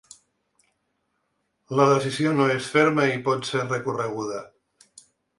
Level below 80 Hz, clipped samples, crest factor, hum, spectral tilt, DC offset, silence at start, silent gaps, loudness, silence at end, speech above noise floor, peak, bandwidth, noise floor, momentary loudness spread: -66 dBFS; under 0.1%; 20 dB; none; -5.5 dB/octave; under 0.1%; 1.7 s; none; -23 LUFS; 0.9 s; 52 dB; -6 dBFS; 11.5 kHz; -74 dBFS; 9 LU